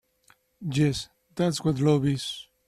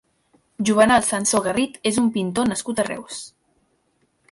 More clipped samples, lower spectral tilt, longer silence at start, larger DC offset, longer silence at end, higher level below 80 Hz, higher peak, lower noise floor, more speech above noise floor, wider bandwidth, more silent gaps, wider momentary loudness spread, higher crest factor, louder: neither; first, -6 dB/octave vs -3.5 dB/octave; about the same, 0.6 s vs 0.6 s; neither; second, 0.25 s vs 1.05 s; about the same, -56 dBFS vs -54 dBFS; second, -10 dBFS vs -4 dBFS; about the same, -63 dBFS vs -66 dBFS; second, 38 dB vs 46 dB; first, 13.5 kHz vs 11.5 kHz; neither; second, 12 LU vs 16 LU; about the same, 18 dB vs 18 dB; second, -26 LUFS vs -20 LUFS